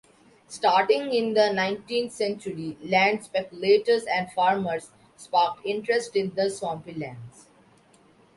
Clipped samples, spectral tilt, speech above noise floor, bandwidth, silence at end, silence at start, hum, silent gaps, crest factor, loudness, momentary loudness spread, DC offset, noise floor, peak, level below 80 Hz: under 0.1%; -4.5 dB/octave; 33 dB; 11.5 kHz; 1.1 s; 0.5 s; none; none; 18 dB; -25 LUFS; 13 LU; under 0.1%; -58 dBFS; -6 dBFS; -68 dBFS